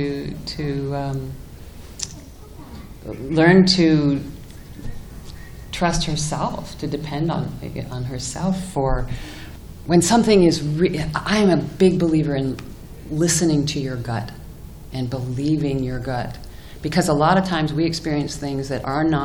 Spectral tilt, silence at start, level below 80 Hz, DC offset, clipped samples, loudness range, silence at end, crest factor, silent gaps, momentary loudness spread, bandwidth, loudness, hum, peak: -5.5 dB/octave; 0 s; -36 dBFS; under 0.1%; under 0.1%; 7 LU; 0 s; 20 dB; none; 23 LU; 20 kHz; -20 LUFS; none; -2 dBFS